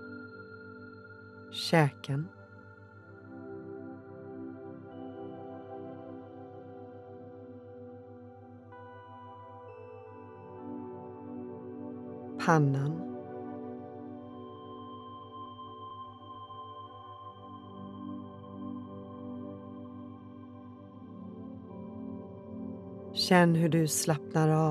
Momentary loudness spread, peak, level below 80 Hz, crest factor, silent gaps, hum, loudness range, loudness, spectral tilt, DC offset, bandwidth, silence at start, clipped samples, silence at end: 22 LU; -10 dBFS; -80 dBFS; 26 dB; none; none; 16 LU; -34 LUFS; -5.5 dB/octave; under 0.1%; 14 kHz; 0 s; under 0.1%; 0 s